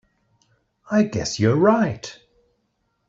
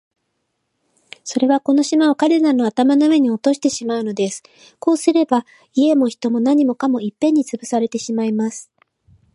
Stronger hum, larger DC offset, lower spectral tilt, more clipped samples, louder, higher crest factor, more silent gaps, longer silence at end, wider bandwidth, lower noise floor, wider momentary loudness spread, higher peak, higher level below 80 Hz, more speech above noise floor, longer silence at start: neither; neither; first, -6 dB/octave vs -4.5 dB/octave; neither; second, -20 LUFS vs -17 LUFS; about the same, 20 dB vs 16 dB; neither; first, 0.95 s vs 0.7 s; second, 7.8 kHz vs 11.5 kHz; about the same, -71 dBFS vs -72 dBFS; first, 14 LU vs 8 LU; about the same, -4 dBFS vs -2 dBFS; first, -56 dBFS vs -70 dBFS; about the same, 52 dB vs 55 dB; second, 0.9 s vs 1.25 s